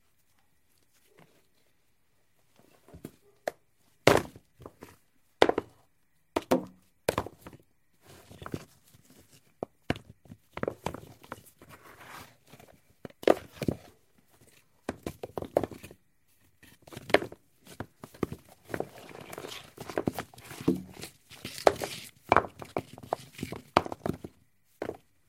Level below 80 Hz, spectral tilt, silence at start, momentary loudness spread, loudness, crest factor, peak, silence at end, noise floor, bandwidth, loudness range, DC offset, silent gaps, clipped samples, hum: -58 dBFS; -5 dB/octave; 2.95 s; 24 LU; -32 LUFS; 34 dB; 0 dBFS; 0.35 s; -74 dBFS; 16 kHz; 10 LU; under 0.1%; none; under 0.1%; none